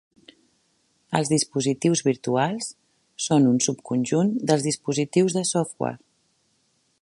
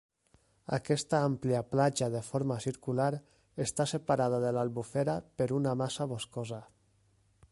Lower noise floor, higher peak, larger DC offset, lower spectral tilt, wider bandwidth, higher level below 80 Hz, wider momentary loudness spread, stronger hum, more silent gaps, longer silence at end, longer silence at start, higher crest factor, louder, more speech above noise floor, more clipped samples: about the same, -68 dBFS vs -69 dBFS; first, -4 dBFS vs -14 dBFS; neither; about the same, -5 dB/octave vs -5.5 dB/octave; about the same, 11.5 kHz vs 11.5 kHz; about the same, -68 dBFS vs -66 dBFS; about the same, 10 LU vs 10 LU; neither; neither; first, 1.05 s vs 0.85 s; first, 1.1 s vs 0.7 s; about the same, 20 dB vs 20 dB; first, -23 LUFS vs -32 LUFS; first, 45 dB vs 37 dB; neither